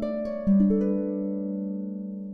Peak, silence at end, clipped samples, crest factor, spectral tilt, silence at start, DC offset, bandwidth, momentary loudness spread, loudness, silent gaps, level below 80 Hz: -12 dBFS; 0 s; under 0.1%; 14 dB; -11.5 dB/octave; 0 s; under 0.1%; 4.7 kHz; 12 LU; -26 LUFS; none; -48 dBFS